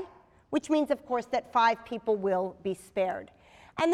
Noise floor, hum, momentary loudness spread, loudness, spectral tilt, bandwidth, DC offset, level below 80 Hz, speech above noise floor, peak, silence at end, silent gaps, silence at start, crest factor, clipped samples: -52 dBFS; none; 11 LU; -29 LUFS; -5 dB/octave; 13.5 kHz; under 0.1%; -66 dBFS; 23 dB; -12 dBFS; 0 s; none; 0 s; 18 dB; under 0.1%